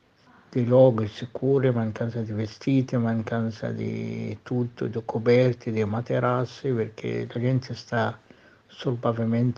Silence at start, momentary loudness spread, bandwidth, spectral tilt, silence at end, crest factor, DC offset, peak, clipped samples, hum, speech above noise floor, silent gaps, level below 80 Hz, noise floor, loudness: 0.5 s; 11 LU; 7 kHz; -8.5 dB/octave; 0.05 s; 18 dB; under 0.1%; -6 dBFS; under 0.1%; none; 32 dB; none; -64 dBFS; -57 dBFS; -26 LUFS